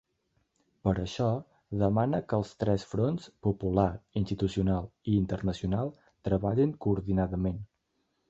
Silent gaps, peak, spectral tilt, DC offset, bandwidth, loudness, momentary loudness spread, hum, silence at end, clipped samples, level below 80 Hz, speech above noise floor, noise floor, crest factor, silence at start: none; -10 dBFS; -8.5 dB/octave; under 0.1%; 7.8 kHz; -30 LUFS; 6 LU; none; 0.65 s; under 0.1%; -46 dBFS; 48 dB; -77 dBFS; 20 dB; 0.85 s